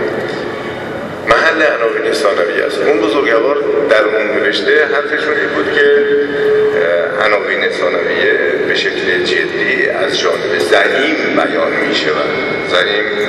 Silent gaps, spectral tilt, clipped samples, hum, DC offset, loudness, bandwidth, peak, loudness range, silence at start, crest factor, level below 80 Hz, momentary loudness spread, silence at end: none; -4 dB/octave; under 0.1%; none; under 0.1%; -13 LUFS; 12.5 kHz; 0 dBFS; 1 LU; 0 s; 12 dB; -50 dBFS; 4 LU; 0 s